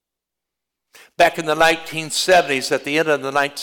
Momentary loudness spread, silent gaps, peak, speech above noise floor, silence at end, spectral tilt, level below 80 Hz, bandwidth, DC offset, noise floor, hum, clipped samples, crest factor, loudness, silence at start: 5 LU; none; -6 dBFS; 66 dB; 0 s; -2.5 dB/octave; -58 dBFS; 19 kHz; under 0.1%; -84 dBFS; none; under 0.1%; 14 dB; -17 LUFS; 1.2 s